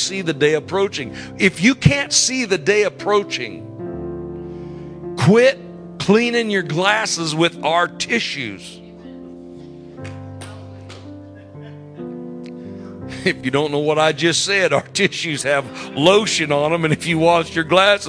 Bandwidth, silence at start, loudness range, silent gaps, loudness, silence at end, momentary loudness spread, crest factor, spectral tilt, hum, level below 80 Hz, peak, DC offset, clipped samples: 11 kHz; 0 s; 17 LU; none; -17 LUFS; 0 s; 22 LU; 20 dB; -4 dB/octave; none; -48 dBFS; 0 dBFS; under 0.1%; under 0.1%